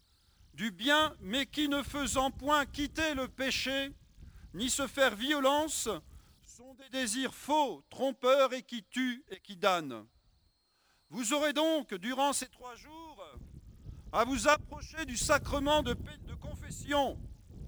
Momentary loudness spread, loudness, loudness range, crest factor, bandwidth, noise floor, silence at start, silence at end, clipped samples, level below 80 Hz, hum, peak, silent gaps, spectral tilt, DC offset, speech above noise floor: 20 LU; -32 LUFS; 3 LU; 22 dB; over 20 kHz; -72 dBFS; 0.55 s; 0 s; under 0.1%; -52 dBFS; none; -12 dBFS; none; -3 dB/octave; under 0.1%; 40 dB